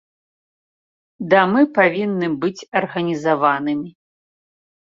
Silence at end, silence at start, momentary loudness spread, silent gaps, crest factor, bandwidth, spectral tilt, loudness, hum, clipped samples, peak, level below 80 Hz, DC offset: 1 s; 1.2 s; 10 LU; 2.68-2.72 s; 18 dB; 7.4 kHz; -6.5 dB/octave; -18 LUFS; none; under 0.1%; -2 dBFS; -66 dBFS; under 0.1%